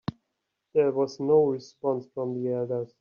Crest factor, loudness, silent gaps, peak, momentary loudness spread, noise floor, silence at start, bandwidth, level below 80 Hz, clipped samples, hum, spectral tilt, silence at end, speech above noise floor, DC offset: 16 dB; -27 LUFS; none; -10 dBFS; 9 LU; -81 dBFS; 0.75 s; 7 kHz; -70 dBFS; under 0.1%; none; -7.5 dB/octave; 0.15 s; 55 dB; under 0.1%